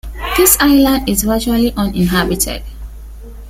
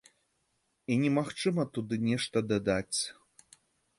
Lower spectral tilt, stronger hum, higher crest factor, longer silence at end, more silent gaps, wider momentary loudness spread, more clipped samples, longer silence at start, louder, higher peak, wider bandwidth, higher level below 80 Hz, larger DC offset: about the same, -4 dB/octave vs -5 dB/octave; neither; about the same, 14 dB vs 18 dB; second, 0 s vs 0.85 s; neither; first, 19 LU vs 5 LU; neither; second, 0.05 s vs 0.9 s; first, -13 LUFS vs -31 LUFS; first, 0 dBFS vs -14 dBFS; first, 16.5 kHz vs 11.5 kHz; first, -26 dBFS vs -62 dBFS; neither